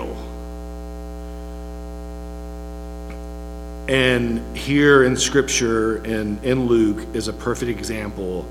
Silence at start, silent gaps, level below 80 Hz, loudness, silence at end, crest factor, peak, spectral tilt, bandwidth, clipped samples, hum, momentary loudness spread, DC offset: 0 s; none; -34 dBFS; -19 LUFS; 0 s; 20 dB; -2 dBFS; -4.5 dB/octave; 16 kHz; under 0.1%; 60 Hz at -35 dBFS; 18 LU; under 0.1%